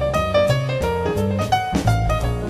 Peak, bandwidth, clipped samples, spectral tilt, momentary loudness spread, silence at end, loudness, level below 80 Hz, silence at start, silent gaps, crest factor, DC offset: -6 dBFS; 14.5 kHz; under 0.1%; -6 dB/octave; 3 LU; 0 s; -20 LUFS; -30 dBFS; 0 s; none; 14 dB; under 0.1%